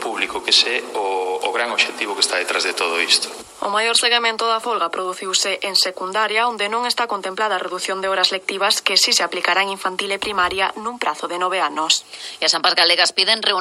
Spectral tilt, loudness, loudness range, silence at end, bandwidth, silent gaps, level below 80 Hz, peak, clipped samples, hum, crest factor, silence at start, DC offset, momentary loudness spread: 0 dB/octave; -18 LUFS; 2 LU; 0 s; 15.5 kHz; none; -62 dBFS; 0 dBFS; under 0.1%; none; 20 dB; 0 s; under 0.1%; 9 LU